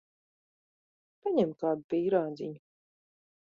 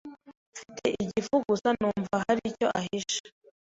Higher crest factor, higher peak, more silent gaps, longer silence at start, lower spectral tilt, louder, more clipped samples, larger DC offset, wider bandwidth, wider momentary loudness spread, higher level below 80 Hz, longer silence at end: about the same, 20 dB vs 18 dB; about the same, -14 dBFS vs -12 dBFS; second, 1.84-1.89 s vs 0.37-0.52 s, 3.20-3.24 s; first, 1.25 s vs 0.05 s; first, -9 dB/octave vs -4.5 dB/octave; about the same, -31 LUFS vs -29 LUFS; neither; neither; second, 7 kHz vs 8 kHz; second, 12 LU vs 17 LU; second, -76 dBFS vs -62 dBFS; first, 0.9 s vs 0.4 s